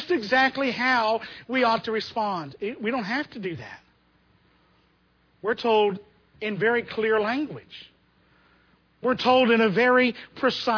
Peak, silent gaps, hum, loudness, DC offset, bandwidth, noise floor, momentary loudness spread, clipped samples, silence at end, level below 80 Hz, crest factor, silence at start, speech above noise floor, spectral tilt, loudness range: -8 dBFS; none; none; -24 LUFS; under 0.1%; 5.4 kHz; -64 dBFS; 15 LU; under 0.1%; 0 s; -66 dBFS; 18 dB; 0 s; 40 dB; -5.5 dB/octave; 8 LU